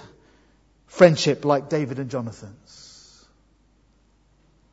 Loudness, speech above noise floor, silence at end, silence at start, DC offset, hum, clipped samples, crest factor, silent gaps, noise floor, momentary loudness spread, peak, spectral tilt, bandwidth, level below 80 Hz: -20 LUFS; 40 dB; 2.2 s; 0.95 s; under 0.1%; none; under 0.1%; 24 dB; none; -60 dBFS; 28 LU; 0 dBFS; -5.5 dB/octave; 8 kHz; -62 dBFS